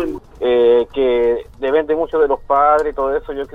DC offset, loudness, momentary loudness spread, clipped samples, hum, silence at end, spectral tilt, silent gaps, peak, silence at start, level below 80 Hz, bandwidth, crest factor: under 0.1%; -16 LUFS; 8 LU; under 0.1%; none; 0.1 s; -6.5 dB/octave; none; -2 dBFS; 0 s; -40 dBFS; 5 kHz; 14 dB